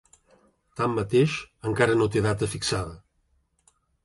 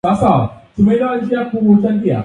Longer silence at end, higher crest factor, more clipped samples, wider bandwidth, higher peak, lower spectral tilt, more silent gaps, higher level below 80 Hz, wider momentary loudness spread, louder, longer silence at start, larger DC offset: first, 1.05 s vs 0 s; first, 22 dB vs 14 dB; neither; first, 11.5 kHz vs 9.4 kHz; second, -6 dBFS vs 0 dBFS; second, -5.5 dB/octave vs -9 dB/octave; neither; second, -50 dBFS vs -42 dBFS; first, 9 LU vs 6 LU; second, -25 LUFS vs -14 LUFS; first, 0.75 s vs 0.05 s; neither